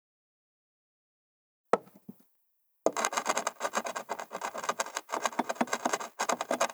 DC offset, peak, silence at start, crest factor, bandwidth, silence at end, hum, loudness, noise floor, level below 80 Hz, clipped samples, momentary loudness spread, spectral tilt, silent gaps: under 0.1%; -8 dBFS; 1.75 s; 28 dB; over 20 kHz; 0 s; none; -33 LUFS; -72 dBFS; -86 dBFS; under 0.1%; 8 LU; -1.5 dB/octave; none